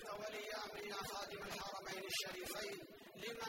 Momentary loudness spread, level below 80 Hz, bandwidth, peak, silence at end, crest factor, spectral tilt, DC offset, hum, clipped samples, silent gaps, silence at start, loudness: 7 LU; -72 dBFS; 16 kHz; -30 dBFS; 0 s; 18 dB; -2 dB/octave; under 0.1%; none; under 0.1%; none; 0 s; -46 LUFS